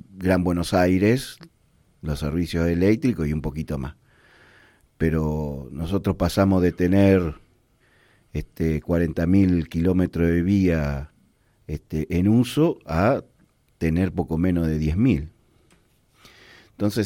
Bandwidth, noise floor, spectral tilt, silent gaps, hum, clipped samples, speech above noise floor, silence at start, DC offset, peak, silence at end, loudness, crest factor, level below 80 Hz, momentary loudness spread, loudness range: 16.5 kHz; -61 dBFS; -7.5 dB/octave; none; none; under 0.1%; 40 dB; 0.15 s; under 0.1%; -6 dBFS; 0 s; -22 LUFS; 16 dB; -40 dBFS; 12 LU; 4 LU